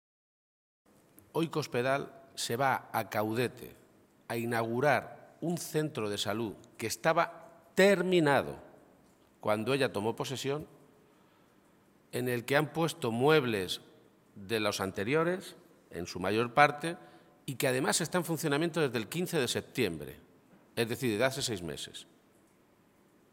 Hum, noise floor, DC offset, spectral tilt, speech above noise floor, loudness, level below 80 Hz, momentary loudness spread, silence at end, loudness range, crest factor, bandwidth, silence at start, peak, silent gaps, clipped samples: none; -66 dBFS; under 0.1%; -4.5 dB/octave; 34 dB; -32 LUFS; -70 dBFS; 16 LU; 1.3 s; 5 LU; 26 dB; 17 kHz; 1.35 s; -6 dBFS; none; under 0.1%